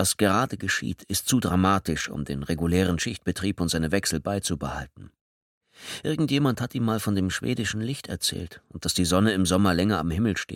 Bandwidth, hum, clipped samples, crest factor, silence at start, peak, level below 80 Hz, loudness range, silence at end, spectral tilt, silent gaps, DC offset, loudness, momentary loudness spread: 17.5 kHz; none; under 0.1%; 18 dB; 0 s; -8 dBFS; -46 dBFS; 3 LU; 0 s; -4.5 dB/octave; 5.21-5.61 s; under 0.1%; -25 LUFS; 10 LU